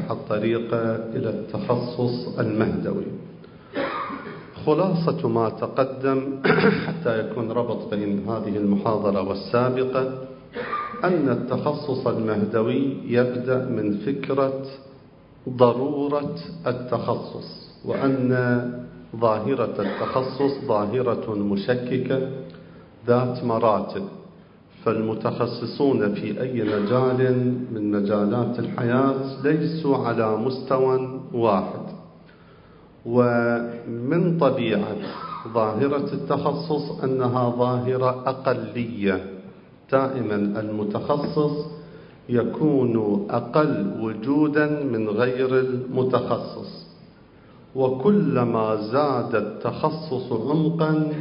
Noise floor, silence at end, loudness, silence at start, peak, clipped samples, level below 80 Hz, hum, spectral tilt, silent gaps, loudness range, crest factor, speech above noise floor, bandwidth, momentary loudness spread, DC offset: -49 dBFS; 0 s; -23 LUFS; 0 s; -2 dBFS; under 0.1%; -58 dBFS; none; -12 dB/octave; none; 3 LU; 22 dB; 27 dB; 5.4 kHz; 10 LU; under 0.1%